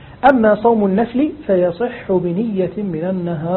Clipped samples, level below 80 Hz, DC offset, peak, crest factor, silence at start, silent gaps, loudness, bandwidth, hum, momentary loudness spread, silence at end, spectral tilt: under 0.1%; -46 dBFS; under 0.1%; 0 dBFS; 16 dB; 0 s; none; -17 LUFS; 4.3 kHz; none; 8 LU; 0 s; -10.5 dB/octave